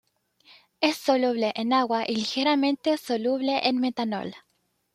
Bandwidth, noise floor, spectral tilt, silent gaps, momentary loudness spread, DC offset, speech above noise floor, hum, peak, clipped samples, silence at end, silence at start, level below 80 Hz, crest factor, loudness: 15.5 kHz; -59 dBFS; -4 dB/octave; none; 5 LU; under 0.1%; 34 dB; none; -6 dBFS; under 0.1%; 0.55 s; 0.8 s; -74 dBFS; 20 dB; -25 LUFS